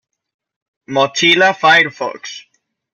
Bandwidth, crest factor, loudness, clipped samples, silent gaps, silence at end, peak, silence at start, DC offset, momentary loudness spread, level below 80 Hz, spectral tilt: 14 kHz; 16 dB; -12 LUFS; under 0.1%; none; 0.55 s; 0 dBFS; 0.9 s; under 0.1%; 19 LU; -64 dBFS; -2.5 dB/octave